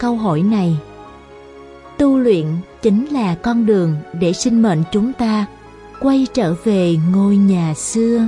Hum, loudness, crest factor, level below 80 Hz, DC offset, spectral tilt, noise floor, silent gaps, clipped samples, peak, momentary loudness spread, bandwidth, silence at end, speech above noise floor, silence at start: none; -16 LUFS; 14 dB; -46 dBFS; under 0.1%; -6.5 dB/octave; -38 dBFS; none; under 0.1%; -2 dBFS; 6 LU; 11.5 kHz; 0 s; 24 dB; 0 s